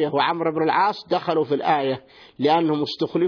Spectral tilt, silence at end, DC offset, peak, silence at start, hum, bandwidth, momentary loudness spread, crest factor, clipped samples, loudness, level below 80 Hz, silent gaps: -7 dB/octave; 0 s; under 0.1%; -6 dBFS; 0 s; none; 5.4 kHz; 5 LU; 16 dB; under 0.1%; -22 LUFS; -68 dBFS; none